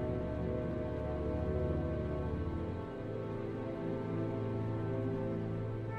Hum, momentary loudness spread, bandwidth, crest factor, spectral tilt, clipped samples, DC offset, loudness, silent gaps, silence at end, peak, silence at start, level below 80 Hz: none; 4 LU; 6.4 kHz; 14 dB; -10 dB/octave; under 0.1%; under 0.1%; -38 LUFS; none; 0 s; -24 dBFS; 0 s; -48 dBFS